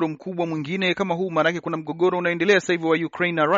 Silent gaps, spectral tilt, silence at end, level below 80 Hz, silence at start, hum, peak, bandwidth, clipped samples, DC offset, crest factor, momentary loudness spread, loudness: none; -3.5 dB/octave; 0 s; -66 dBFS; 0 s; none; -6 dBFS; 7.6 kHz; under 0.1%; under 0.1%; 16 dB; 8 LU; -22 LUFS